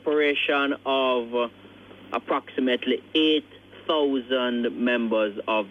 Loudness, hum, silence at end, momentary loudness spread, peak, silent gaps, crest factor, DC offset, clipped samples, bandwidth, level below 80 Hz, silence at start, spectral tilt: -24 LUFS; none; 0 s; 7 LU; -10 dBFS; none; 14 dB; under 0.1%; under 0.1%; 7.2 kHz; -68 dBFS; 0.05 s; -5.5 dB/octave